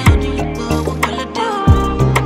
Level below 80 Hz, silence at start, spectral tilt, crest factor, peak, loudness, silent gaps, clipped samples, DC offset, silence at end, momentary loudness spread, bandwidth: -20 dBFS; 0 s; -6 dB/octave; 14 dB; 0 dBFS; -16 LUFS; none; under 0.1%; under 0.1%; 0 s; 6 LU; 16 kHz